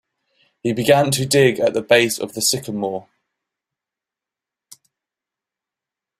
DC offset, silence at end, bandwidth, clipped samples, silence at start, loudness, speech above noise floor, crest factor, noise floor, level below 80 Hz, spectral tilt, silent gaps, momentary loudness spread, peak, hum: under 0.1%; 3.2 s; 16 kHz; under 0.1%; 0.65 s; -18 LUFS; 70 dB; 20 dB; -87 dBFS; -58 dBFS; -4 dB/octave; none; 11 LU; -2 dBFS; none